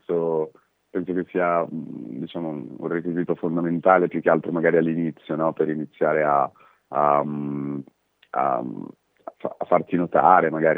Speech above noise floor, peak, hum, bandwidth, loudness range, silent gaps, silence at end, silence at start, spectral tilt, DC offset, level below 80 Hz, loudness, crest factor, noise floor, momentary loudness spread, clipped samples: 26 dB; 0 dBFS; none; 4 kHz; 5 LU; none; 0 s; 0.1 s; -10 dB/octave; under 0.1%; -72 dBFS; -23 LUFS; 22 dB; -48 dBFS; 15 LU; under 0.1%